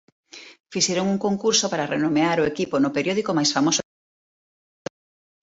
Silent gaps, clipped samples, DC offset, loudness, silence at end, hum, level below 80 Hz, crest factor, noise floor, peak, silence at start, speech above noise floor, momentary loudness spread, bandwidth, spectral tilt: 0.60-0.64 s; under 0.1%; under 0.1%; -22 LUFS; 1.6 s; none; -62 dBFS; 18 dB; under -90 dBFS; -6 dBFS; 0.35 s; over 69 dB; 19 LU; 8 kHz; -3.5 dB/octave